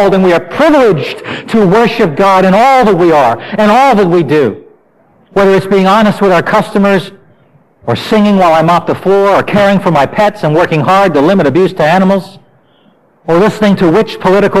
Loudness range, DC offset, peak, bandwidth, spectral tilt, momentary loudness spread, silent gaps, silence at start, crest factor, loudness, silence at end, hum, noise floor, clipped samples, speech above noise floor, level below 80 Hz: 3 LU; under 0.1%; -2 dBFS; 15 kHz; -6.5 dB/octave; 7 LU; none; 0 s; 8 dB; -8 LUFS; 0 s; none; -47 dBFS; under 0.1%; 40 dB; -40 dBFS